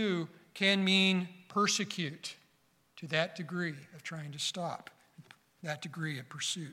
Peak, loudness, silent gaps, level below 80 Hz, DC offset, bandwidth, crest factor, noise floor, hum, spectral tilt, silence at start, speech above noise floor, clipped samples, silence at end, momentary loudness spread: -14 dBFS; -33 LUFS; none; -82 dBFS; under 0.1%; 14.5 kHz; 22 dB; -71 dBFS; none; -3.5 dB/octave; 0 s; 37 dB; under 0.1%; 0 s; 18 LU